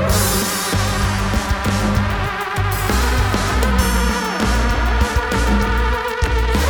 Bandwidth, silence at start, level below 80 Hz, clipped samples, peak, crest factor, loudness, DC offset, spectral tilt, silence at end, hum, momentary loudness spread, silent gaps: over 20 kHz; 0 s; -20 dBFS; under 0.1%; -2 dBFS; 14 dB; -18 LUFS; under 0.1%; -4.5 dB/octave; 0 s; none; 3 LU; none